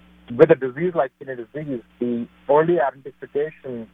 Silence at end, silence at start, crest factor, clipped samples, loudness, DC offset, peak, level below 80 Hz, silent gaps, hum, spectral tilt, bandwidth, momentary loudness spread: 0.1 s; 0.3 s; 20 dB; under 0.1%; -21 LUFS; under 0.1%; -2 dBFS; -60 dBFS; none; none; -9.5 dB/octave; 3.9 kHz; 17 LU